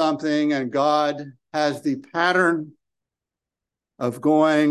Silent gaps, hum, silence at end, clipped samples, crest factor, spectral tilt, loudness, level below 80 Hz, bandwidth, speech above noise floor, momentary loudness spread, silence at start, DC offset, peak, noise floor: none; none; 0 s; under 0.1%; 18 dB; -5.5 dB/octave; -21 LUFS; -74 dBFS; 12.5 kHz; 67 dB; 11 LU; 0 s; under 0.1%; -4 dBFS; -88 dBFS